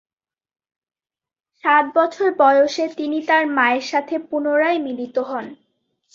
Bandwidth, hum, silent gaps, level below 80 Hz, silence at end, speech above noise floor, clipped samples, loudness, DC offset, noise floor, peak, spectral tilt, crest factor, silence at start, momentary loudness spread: 7.6 kHz; none; none; -70 dBFS; 0.6 s; over 72 dB; under 0.1%; -18 LUFS; under 0.1%; under -90 dBFS; -2 dBFS; -3.5 dB/octave; 18 dB; 1.65 s; 10 LU